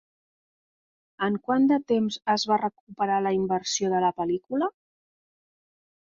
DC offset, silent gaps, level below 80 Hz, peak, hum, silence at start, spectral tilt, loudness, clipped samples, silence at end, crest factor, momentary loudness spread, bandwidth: under 0.1%; 2.80-2.87 s; -68 dBFS; -10 dBFS; none; 1.2 s; -4.5 dB/octave; -26 LUFS; under 0.1%; 1.35 s; 18 dB; 8 LU; 7.6 kHz